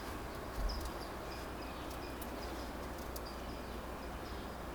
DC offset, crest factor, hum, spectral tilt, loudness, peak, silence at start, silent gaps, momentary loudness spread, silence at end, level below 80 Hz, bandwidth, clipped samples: under 0.1%; 16 dB; none; -5 dB/octave; -44 LUFS; -26 dBFS; 0 s; none; 3 LU; 0 s; -48 dBFS; over 20 kHz; under 0.1%